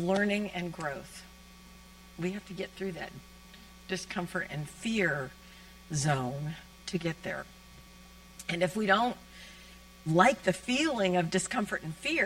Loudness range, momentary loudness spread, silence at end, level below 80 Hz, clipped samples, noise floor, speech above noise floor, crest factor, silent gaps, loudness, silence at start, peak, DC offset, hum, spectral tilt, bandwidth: 10 LU; 25 LU; 0 s; -58 dBFS; under 0.1%; -53 dBFS; 22 dB; 24 dB; none; -31 LUFS; 0 s; -8 dBFS; under 0.1%; none; -4.5 dB/octave; 16.5 kHz